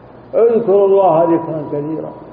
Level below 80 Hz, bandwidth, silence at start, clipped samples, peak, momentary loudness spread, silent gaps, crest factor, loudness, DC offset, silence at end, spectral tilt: -56 dBFS; 4 kHz; 0.35 s; under 0.1%; -2 dBFS; 11 LU; none; 12 dB; -14 LUFS; under 0.1%; 0 s; -12.5 dB/octave